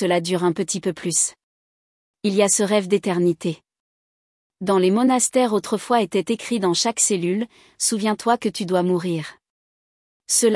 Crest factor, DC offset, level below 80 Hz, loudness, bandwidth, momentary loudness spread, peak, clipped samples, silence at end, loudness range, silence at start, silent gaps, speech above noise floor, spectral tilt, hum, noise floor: 16 dB; under 0.1%; -68 dBFS; -20 LUFS; 12 kHz; 9 LU; -6 dBFS; under 0.1%; 0 s; 3 LU; 0 s; 1.44-2.14 s, 3.80-4.50 s, 9.50-10.20 s; over 70 dB; -4 dB/octave; none; under -90 dBFS